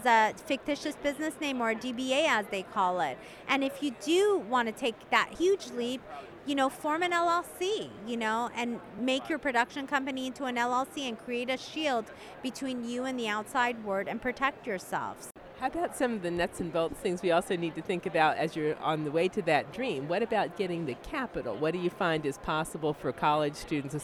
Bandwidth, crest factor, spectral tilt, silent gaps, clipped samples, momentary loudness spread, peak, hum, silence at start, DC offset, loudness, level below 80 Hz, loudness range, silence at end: 15.5 kHz; 22 dB; -4.5 dB/octave; none; under 0.1%; 8 LU; -10 dBFS; none; 0 s; under 0.1%; -31 LUFS; -60 dBFS; 4 LU; 0 s